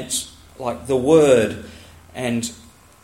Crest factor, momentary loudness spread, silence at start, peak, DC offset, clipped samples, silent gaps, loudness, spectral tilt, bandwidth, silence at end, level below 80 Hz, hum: 18 dB; 22 LU; 0 s; -2 dBFS; under 0.1%; under 0.1%; none; -19 LUFS; -4.5 dB/octave; 16.5 kHz; 0.5 s; -50 dBFS; none